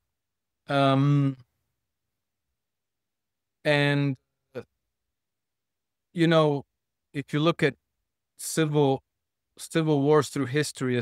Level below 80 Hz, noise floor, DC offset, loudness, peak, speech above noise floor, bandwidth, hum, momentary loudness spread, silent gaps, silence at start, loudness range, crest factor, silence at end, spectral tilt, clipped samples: -72 dBFS; -88 dBFS; under 0.1%; -25 LUFS; -8 dBFS; 64 dB; 15 kHz; none; 18 LU; none; 0.7 s; 4 LU; 20 dB; 0 s; -6 dB/octave; under 0.1%